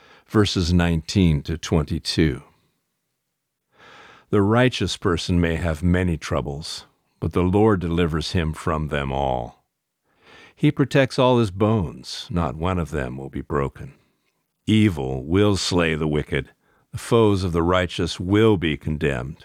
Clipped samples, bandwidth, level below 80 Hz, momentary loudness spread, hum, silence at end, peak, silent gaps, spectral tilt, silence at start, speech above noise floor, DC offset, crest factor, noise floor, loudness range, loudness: under 0.1%; 14.5 kHz; -38 dBFS; 11 LU; none; 0.1 s; -4 dBFS; none; -6 dB/octave; 0.3 s; 57 dB; under 0.1%; 18 dB; -78 dBFS; 4 LU; -22 LUFS